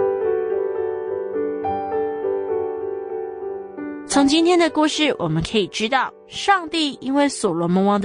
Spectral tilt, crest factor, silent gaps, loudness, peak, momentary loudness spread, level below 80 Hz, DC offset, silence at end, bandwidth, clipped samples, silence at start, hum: -4.5 dB/octave; 16 dB; none; -21 LUFS; -4 dBFS; 12 LU; -52 dBFS; under 0.1%; 0 s; 10 kHz; under 0.1%; 0 s; none